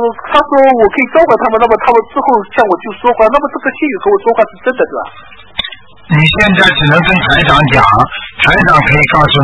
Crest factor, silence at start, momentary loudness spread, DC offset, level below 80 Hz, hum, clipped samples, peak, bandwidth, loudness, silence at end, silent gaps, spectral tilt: 10 dB; 0 s; 9 LU; under 0.1%; -30 dBFS; none; 1%; 0 dBFS; 11 kHz; -9 LUFS; 0 s; none; -6.5 dB/octave